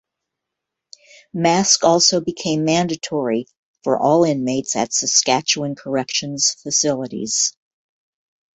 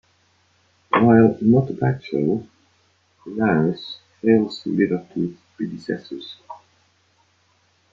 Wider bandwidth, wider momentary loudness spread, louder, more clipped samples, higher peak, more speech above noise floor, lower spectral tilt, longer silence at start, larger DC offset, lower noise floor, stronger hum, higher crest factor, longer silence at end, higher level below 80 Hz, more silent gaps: first, 8.2 kHz vs 7.4 kHz; second, 9 LU vs 19 LU; about the same, -18 LUFS vs -20 LUFS; neither; about the same, 0 dBFS vs -2 dBFS; first, 64 dB vs 43 dB; second, -3 dB/octave vs -8.5 dB/octave; first, 1.35 s vs 0.9 s; neither; first, -82 dBFS vs -62 dBFS; neither; about the same, 20 dB vs 20 dB; second, 1.05 s vs 1.35 s; about the same, -60 dBFS vs -60 dBFS; first, 3.57-3.74 s vs none